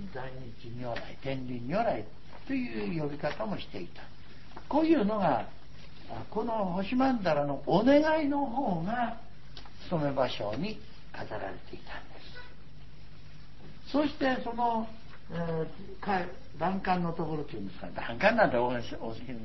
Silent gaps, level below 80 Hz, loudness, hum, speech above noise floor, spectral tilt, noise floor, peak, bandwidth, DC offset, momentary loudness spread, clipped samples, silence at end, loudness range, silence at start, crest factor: none; -54 dBFS; -31 LUFS; none; 21 dB; -7.5 dB/octave; -52 dBFS; -10 dBFS; 6 kHz; 1%; 22 LU; under 0.1%; 0 s; 8 LU; 0 s; 22 dB